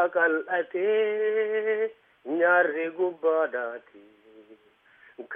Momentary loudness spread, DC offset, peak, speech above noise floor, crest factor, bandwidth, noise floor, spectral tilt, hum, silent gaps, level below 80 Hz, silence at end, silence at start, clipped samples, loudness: 12 LU; under 0.1%; -10 dBFS; 33 dB; 16 dB; 3.7 kHz; -59 dBFS; -7.5 dB/octave; none; none; -86 dBFS; 0 s; 0 s; under 0.1%; -26 LUFS